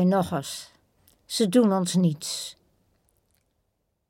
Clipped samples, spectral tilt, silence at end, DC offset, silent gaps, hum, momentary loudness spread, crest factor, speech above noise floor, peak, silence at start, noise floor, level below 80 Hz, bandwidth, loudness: under 0.1%; -5.5 dB/octave; 1.6 s; under 0.1%; none; none; 15 LU; 18 dB; 52 dB; -8 dBFS; 0 s; -75 dBFS; -66 dBFS; 16.5 kHz; -25 LUFS